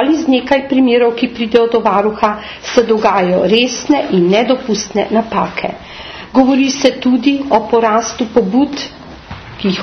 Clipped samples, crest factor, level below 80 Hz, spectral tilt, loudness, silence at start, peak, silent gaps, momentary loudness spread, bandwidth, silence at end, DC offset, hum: under 0.1%; 12 dB; -44 dBFS; -5 dB/octave; -13 LUFS; 0 s; 0 dBFS; none; 11 LU; 6.6 kHz; 0 s; under 0.1%; none